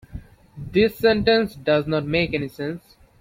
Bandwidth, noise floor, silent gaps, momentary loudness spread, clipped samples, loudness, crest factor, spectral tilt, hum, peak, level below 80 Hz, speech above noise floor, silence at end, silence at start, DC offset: 16.5 kHz; -40 dBFS; none; 20 LU; under 0.1%; -21 LUFS; 18 dB; -7 dB/octave; none; -4 dBFS; -46 dBFS; 19 dB; 0.45 s; 0.15 s; under 0.1%